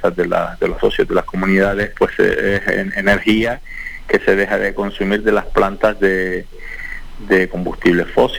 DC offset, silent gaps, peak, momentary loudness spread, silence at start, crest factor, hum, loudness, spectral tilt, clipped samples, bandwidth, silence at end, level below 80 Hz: 0.5%; none; -2 dBFS; 12 LU; 0 s; 14 dB; none; -16 LUFS; -6 dB/octave; under 0.1%; 20 kHz; 0 s; -32 dBFS